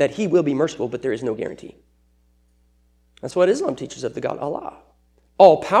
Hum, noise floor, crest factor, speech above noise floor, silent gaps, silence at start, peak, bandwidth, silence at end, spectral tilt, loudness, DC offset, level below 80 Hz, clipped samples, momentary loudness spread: none; -60 dBFS; 20 dB; 40 dB; none; 0 s; 0 dBFS; 10.5 kHz; 0 s; -6 dB/octave; -20 LUFS; under 0.1%; -58 dBFS; under 0.1%; 18 LU